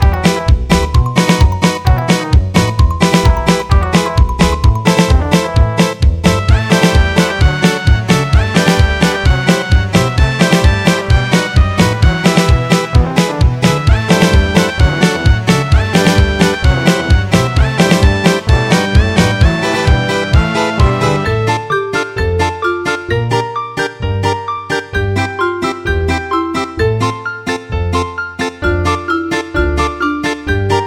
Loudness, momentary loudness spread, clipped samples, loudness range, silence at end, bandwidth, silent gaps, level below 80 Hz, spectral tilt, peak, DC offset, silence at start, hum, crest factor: -12 LUFS; 6 LU; under 0.1%; 5 LU; 0 s; 15 kHz; none; -16 dBFS; -5.5 dB/octave; 0 dBFS; 0.5%; 0 s; none; 12 dB